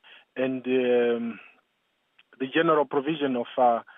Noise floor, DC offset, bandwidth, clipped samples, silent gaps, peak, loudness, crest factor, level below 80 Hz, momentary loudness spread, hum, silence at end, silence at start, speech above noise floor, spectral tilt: -73 dBFS; under 0.1%; 3.8 kHz; under 0.1%; none; -10 dBFS; -25 LUFS; 16 dB; -88 dBFS; 13 LU; none; 0.15 s; 0.35 s; 49 dB; -9 dB/octave